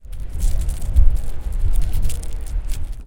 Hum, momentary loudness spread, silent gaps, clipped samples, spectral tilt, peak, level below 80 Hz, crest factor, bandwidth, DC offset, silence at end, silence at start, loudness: none; 10 LU; none; under 0.1%; -5.5 dB/octave; 0 dBFS; -18 dBFS; 16 dB; 16.5 kHz; under 0.1%; 0 s; 0.05 s; -25 LUFS